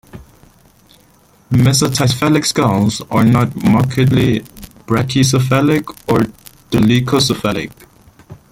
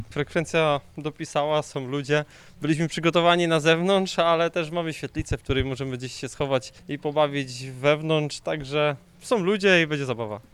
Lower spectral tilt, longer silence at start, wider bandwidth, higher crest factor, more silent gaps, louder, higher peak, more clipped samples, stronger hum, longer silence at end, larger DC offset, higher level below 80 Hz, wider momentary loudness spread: about the same, -5.5 dB/octave vs -5 dB/octave; first, 0.15 s vs 0 s; first, 16.5 kHz vs 13.5 kHz; about the same, 14 dB vs 18 dB; neither; first, -14 LUFS vs -24 LUFS; first, 0 dBFS vs -6 dBFS; neither; neither; about the same, 0.15 s vs 0.1 s; neither; first, -42 dBFS vs -48 dBFS; second, 7 LU vs 12 LU